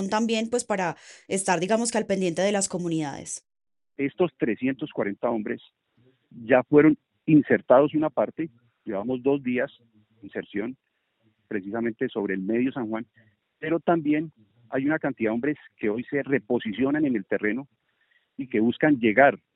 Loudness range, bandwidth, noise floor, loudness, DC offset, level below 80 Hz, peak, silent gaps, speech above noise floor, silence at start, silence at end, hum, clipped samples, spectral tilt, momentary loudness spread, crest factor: 8 LU; 11.5 kHz; -70 dBFS; -25 LUFS; under 0.1%; -66 dBFS; -2 dBFS; none; 45 dB; 0 s; 0.2 s; none; under 0.1%; -5 dB/octave; 15 LU; 22 dB